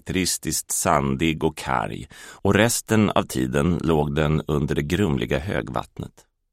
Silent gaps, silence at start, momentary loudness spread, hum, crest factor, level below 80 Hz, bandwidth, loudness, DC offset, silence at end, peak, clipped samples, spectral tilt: none; 0.05 s; 11 LU; none; 20 dB; -40 dBFS; 16 kHz; -22 LUFS; under 0.1%; 0.45 s; -2 dBFS; under 0.1%; -5 dB/octave